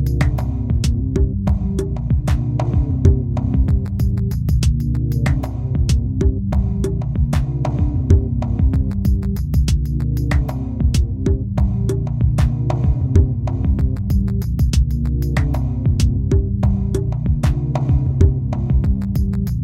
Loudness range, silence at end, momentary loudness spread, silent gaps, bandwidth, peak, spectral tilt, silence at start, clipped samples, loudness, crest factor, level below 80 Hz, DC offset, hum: 1 LU; 0 s; 4 LU; none; 15 kHz; 0 dBFS; -8 dB/octave; 0 s; under 0.1%; -19 LUFS; 16 dB; -20 dBFS; under 0.1%; none